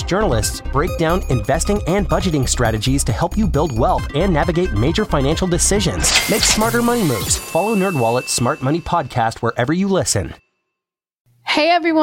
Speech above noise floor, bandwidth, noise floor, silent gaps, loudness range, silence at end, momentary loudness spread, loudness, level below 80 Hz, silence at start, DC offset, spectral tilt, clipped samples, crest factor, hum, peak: 67 dB; 17 kHz; -84 dBFS; 11.14-11.25 s; 3 LU; 0 s; 6 LU; -17 LUFS; -28 dBFS; 0 s; under 0.1%; -4 dB/octave; under 0.1%; 16 dB; none; -2 dBFS